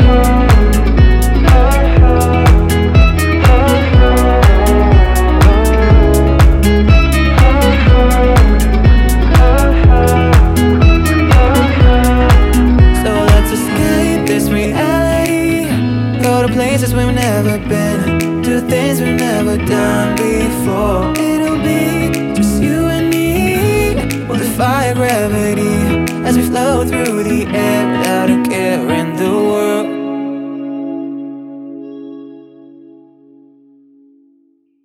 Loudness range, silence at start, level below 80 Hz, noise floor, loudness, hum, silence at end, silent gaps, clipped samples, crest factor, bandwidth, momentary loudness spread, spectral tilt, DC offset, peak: 6 LU; 0 s; -14 dBFS; -55 dBFS; -12 LUFS; none; 2.45 s; none; under 0.1%; 10 dB; 16 kHz; 6 LU; -6.5 dB/octave; under 0.1%; 0 dBFS